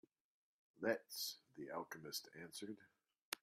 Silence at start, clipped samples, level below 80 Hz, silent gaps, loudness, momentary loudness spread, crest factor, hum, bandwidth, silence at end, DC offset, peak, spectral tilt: 0.75 s; under 0.1%; under -90 dBFS; 3.22-3.32 s; -48 LUFS; 11 LU; 24 dB; none; 15.5 kHz; 0.05 s; under 0.1%; -24 dBFS; -2.5 dB/octave